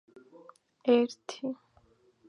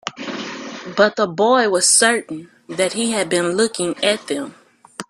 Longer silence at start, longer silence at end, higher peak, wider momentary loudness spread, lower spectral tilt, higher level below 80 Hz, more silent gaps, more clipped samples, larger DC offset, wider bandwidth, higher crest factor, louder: first, 0.85 s vs 0.05 s; first, 0.75 s vs 0.05 s; second, -12 dBFS vs 0 dBFS; second, 13 LU vs 18 LU; first, -4.5 dB/octave vs -2 dB/octave; second, -80 dBFS vs -66 dBFS; neither; neither; neither; second, 10.5 kHz vs 14.5 kHz; about the same, 22 dB vs 18 dB; second, -30 LUFS vs -17 LUFS